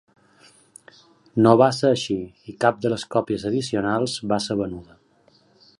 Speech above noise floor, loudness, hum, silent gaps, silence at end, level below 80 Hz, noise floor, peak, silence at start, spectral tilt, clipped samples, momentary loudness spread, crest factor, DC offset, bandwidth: 38 dB; -22 LUFS; none; none; 0.95 s; -56 dBFS; -59 dBFS; -2 dBFS; 1.35 s; -5.5 dB/octave; under 0.1%; 13 LU; 22 dB; under 0.1%; 11.5 kHz